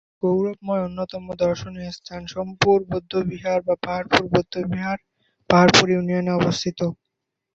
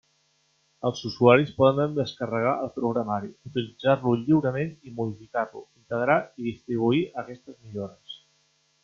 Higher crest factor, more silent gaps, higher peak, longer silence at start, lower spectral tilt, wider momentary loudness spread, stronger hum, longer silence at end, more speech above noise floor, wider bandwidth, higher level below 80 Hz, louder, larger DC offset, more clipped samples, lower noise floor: about the same, 22 dB vs 22 dB; neither; first, 0 dBFS vs -4 dBFS; second, 0.25 s vs 0.85 s; second, -5 dB/octave vs -7.5 dB/octave; about the same, 15 LU vs 17 LU; neither; about the same, 0.6 s vs 0.65 s; first, 59 dB vs 43 dB; first, 8 kHz vs 7.2 kHz; first, -50 dBFS vs -64 dBFS; first, -21 LUFS vs -25 LUFS; neither; neither; first, -80 dBFS vs -68 dBFS